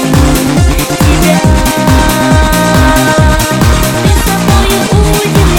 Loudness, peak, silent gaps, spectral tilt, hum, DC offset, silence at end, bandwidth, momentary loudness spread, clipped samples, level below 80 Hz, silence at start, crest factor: -8 LUFS; 0 dBFS; none; -5 dB/octave; none; under 0.1%; 0 s; 18.5 kHz; 2 LU; 0.3%; -14 dBFS; 0 s; 8 dB